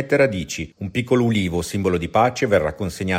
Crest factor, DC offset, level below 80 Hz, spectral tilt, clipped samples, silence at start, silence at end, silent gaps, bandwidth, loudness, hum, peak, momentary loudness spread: 16 dB; under 0.1%; -44 dBFS; -5.5 dB/octave; under 0.1%; 0 s; 0 s; none; 16 kHz; -21 LUFS; none; -4 dBFS; 8 LU